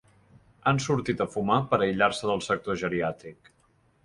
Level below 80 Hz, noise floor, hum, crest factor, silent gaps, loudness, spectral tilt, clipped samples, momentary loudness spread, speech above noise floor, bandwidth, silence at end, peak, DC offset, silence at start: -58 dBFS; -65 dBFS; none; 20 dB; none; -27 LUFS; -5.5 dB/octave; under 0.1%; 6 LU; 39 dB; 11.5 kHz; 0.7 s; -8 dBFS; under 0.1%; 0.65 s